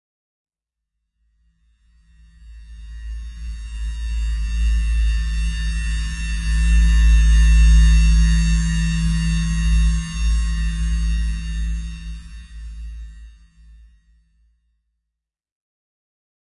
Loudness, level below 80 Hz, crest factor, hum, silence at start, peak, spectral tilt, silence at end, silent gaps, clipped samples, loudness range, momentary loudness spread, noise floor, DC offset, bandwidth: -20 LUFS; -20 dBFS; 14 dB; none; 2.45 s; -6 dBFS; -4 dB/octave; 3.25 s; none; under 0.1%; 20 LU; 21 LU; -83 dBFS; under 0.1%; 11 kHz